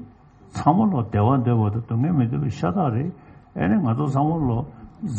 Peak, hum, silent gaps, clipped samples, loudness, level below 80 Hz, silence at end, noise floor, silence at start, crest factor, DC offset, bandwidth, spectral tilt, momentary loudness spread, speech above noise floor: -2 dBFS; none; none; under 0.1%; -22 LUFS; -48 dBFS; 0 s; -48 dBFS; 0 s; 18 dB; under 0.1%; 8.4 kHz; -9.5 dB/octave; 11 LU; 28 dB